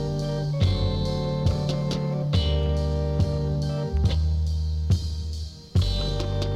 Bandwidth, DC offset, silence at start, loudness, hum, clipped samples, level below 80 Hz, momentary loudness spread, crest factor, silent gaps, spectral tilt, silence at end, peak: 10.5 kHz; under 0.1%; 0 s; -26 LUFS; none; under 0.1%; -30 dBFS; 4 LU; 14 dB; none; -7 dB/octave; 0 s; -10 dBFS